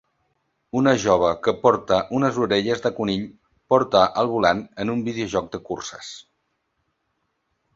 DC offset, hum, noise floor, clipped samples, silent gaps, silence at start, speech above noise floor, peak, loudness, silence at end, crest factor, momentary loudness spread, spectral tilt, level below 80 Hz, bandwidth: under 0.1%; none; -73 dBFS; under 0.1%; none; 0.75 s; 53 dB; -2 dBFS; -21 LUFS; 1.55 s; 20 dB; 13 LU; -5 dB/octave; -54 dBFS; 7.8 kHz